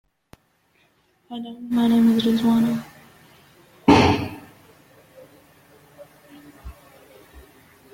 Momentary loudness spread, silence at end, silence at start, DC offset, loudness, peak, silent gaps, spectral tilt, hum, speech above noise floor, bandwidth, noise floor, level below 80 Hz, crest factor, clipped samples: 28 LU; 0.55 s; 1.3 s; under 0.1%; -19 LUFS; -2 dBFS; none; -6 dB/octave; none; 44 dB; 16.5 kHz; -63 dBFS; -50 dBFS; 22 dB; under 0.1%